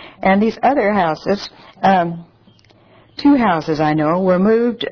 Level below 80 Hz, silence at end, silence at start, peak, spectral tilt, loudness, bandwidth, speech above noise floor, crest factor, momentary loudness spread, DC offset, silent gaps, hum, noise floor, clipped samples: -48 dBFS; 0 s; 0 s; -2 dBFS; -7.5 dB/octave; -16 LUFS; 5.4 kHz; 35 dB; 14 dB; 9 LU; under 0.1%; none; none; -50 dBFS; under 0.1%